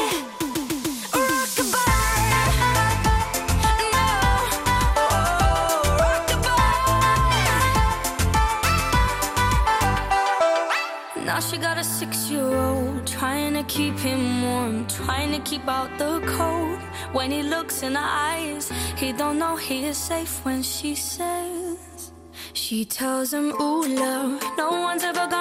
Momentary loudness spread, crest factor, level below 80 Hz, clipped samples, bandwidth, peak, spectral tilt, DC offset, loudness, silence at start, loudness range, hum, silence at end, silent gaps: 8 LU; 14 dB; -32 dBFS; under 0.1%; 16 kHz; -10 dBFS; -4 dB/octave; under 0.1%; -22 LUFS; 0 s; 6 LU; none; 0 s; none